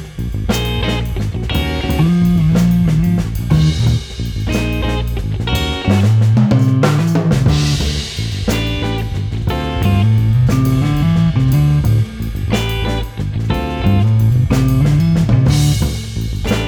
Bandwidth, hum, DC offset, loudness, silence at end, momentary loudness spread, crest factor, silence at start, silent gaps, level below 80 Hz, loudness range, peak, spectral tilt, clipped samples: 20 kHz; none; under 0.1%; -15 LUFS; 0 s; 8 LU; 12 dB; 0 s; none; -24 dBFS; 2 LU; -2 dBFS; -6.5 dB/octave; under 0.1%